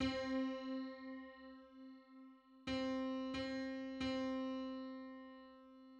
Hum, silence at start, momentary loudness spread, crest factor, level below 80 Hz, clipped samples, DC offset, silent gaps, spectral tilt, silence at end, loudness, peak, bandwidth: none; 0 s; 19 LU; 16 dB; -68 dBFS; under 0.1%; under 0.1%; none; -5.5 dB/octave; 0 s; -44 LUFS; -28 dBFS; 8.6 kHz